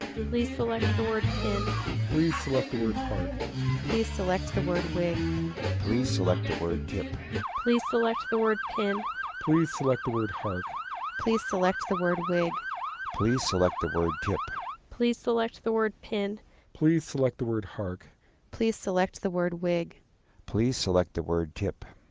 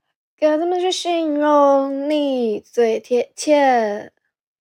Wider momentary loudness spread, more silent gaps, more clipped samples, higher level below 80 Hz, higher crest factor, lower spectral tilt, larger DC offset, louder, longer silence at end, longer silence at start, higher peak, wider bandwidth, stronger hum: about the same, 8 LU vs 7 LU; neither; neither; first, -44 dBFS vs -80 dBFS; about the same, 18 dB vs 14 dB; first, -6 dB/octave vs -3.5 dB/octave; neither; second, -29 LUFS vs -18 LUFS; second, 0.15 s vs 0.55 s; second, 0 s vs 0.4 s; second, -12 dBFS vs -4 dBFS; second, 8 kHz vs 16 kHz; neither